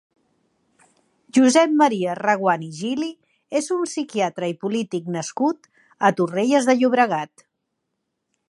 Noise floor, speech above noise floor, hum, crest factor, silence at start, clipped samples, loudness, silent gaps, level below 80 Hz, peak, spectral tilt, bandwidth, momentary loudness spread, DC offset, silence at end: -77 dBFS; 57 dB; none; 20 dB; 1.35 s; under 0.1%; -21 LUFS; none; -76 dBFS; -2 dBFS; -4.5 dB/octave; 11.5 kHz; 11 LU; under 0.1%; 1.2 s